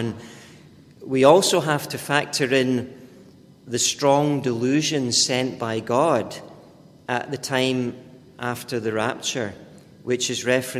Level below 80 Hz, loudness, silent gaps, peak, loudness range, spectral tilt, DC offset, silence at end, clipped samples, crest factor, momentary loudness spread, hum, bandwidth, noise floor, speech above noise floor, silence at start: -62 dBFS; -22 LUFS; none; 0 dBFS; 5 LU; -3.5 dB/octave; under 0.1%; 0 s; under 0.1%; 22 dB; 14 LU; none; 16 kHz; -48 dBFS; 27 dB; 0 s